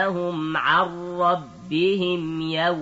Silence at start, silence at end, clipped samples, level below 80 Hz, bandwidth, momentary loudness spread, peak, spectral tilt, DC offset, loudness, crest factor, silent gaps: 0 s; 0 s; under 0.1%; -62 dBFS; 8 kHz; 7 LU; -6 dBFS; -6.5 dB/octave; under 0.1%; -23 LUFS; 16 dB; none